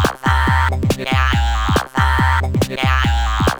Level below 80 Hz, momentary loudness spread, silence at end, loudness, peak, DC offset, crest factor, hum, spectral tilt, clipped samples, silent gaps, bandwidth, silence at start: -20 dBFS; 3 LU; 0 s; -16 LUFS; 0 dBFS; under 0.1%; 16 dB; none; -5.5 dB/octave; under 0.1%; none; over 20 kHz; 0 s